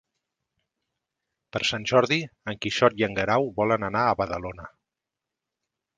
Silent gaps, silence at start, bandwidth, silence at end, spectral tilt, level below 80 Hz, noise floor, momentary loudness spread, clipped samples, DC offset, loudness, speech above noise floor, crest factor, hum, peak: none; 1.55 s; 9.8 kHz; 1.3 s; -5 dB/octave; -56 dBFS; -87 dBFS; 13 LU; under 0.1%; under 0.1%; -24 LUFS; 62 dB; 24 dB; none; -4 dBFS